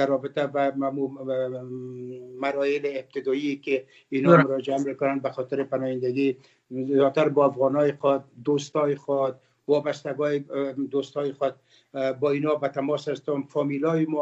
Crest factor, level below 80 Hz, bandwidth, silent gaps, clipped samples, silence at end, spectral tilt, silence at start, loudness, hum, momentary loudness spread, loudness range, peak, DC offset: 22 dB; -76 dBFS; 8 kHz; none; under 0.1%; 0 s; -7 dB/octave; 0 s; -25 LUFS; none; 9 LU; 4 LU; -2 dBFS; under 0.1%